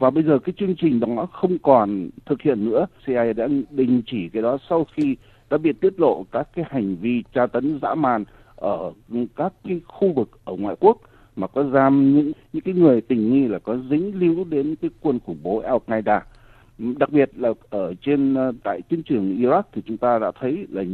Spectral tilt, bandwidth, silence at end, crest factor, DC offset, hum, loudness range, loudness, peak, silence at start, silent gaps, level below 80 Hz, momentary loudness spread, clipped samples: -10 dB/octave; 4.3 kHz; 0 s; 20 dB; under 0.1%; none; 5 LU; -21 LUFS; 0 dBFS; 0 s; none; -54 dBFS; 11 LU; under 0.1%